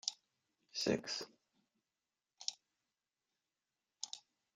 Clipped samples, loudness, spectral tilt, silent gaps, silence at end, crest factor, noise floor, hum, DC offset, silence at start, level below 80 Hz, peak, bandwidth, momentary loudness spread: under 0.1%; -43 LUFS; -2.5 dB/octave; none; 0.35 s; 30 dB; under -90 dBFS; none; under 0.1%; 0.05 s; -82 dBFS; -16 dBFS; 13 kHz; 15 LU